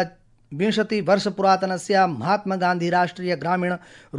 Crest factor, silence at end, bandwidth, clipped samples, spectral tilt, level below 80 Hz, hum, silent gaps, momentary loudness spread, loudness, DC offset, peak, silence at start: 18 dB; 0 s; 11.5 kHz; under 0.1%; -5.5 dB/octave; -64 dBFS; none; none; 7 LU; -22 LUFS; under 0.1%; -4 dBFS; 0 s